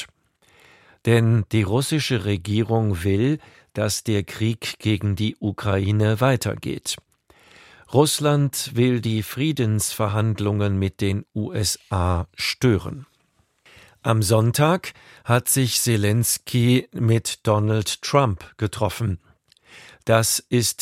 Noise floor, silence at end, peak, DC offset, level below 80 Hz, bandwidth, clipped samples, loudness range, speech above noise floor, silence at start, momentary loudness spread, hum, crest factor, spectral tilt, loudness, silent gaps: -65 dBFS; 0 s; -2 dBFS; under 0.1%; -48 dBFS; 16 kHz; under 0.1%; 3 LU; 44 dB; 0 s; 9 LU; none; 20 dB; -5 dB/octave; -22 LUFS; none